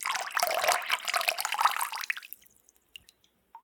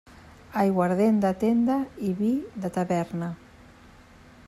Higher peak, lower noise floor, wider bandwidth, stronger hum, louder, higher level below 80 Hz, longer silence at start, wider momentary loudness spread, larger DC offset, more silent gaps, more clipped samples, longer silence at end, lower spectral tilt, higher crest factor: first, -6 dBFS vs -10 dBFS; first, -65 dBFS vs -51 dBFS; first, 19 kHz vs 14 kHz; neither; second, -28 LUFS vs -25 LUFS; second, -80 dBFS vs -58 dBFS; second, 0 s vs 0.25 s; about the same, 9 LU vs 11 LU; neither; neither; neither; second, 0.05 s vs 1.1 s; second, 2.5 dB/octave vs -8 dB/octave; first, 26 dB vs 16 dB